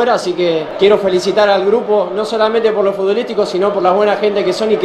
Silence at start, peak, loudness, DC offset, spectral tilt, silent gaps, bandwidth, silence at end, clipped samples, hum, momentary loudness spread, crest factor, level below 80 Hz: 0 s; 0 dBFS; -13 LUFS; under 0.1%; -5 dB/octave; none; 11.5 kHz; 0 s; under 0.1%; none; 4 LU; 12 dB; -54 dBFS